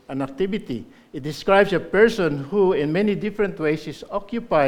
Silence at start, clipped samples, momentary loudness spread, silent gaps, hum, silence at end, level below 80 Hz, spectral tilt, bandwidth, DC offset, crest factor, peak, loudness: 0.1 s; under 0.1%; 14 LU; none; none; 0 s; -48 dBFS; -6.5 dB/octave; 14.5 kHz; under 0.1%; 20 dB; -2 dBFS; -21 LUFS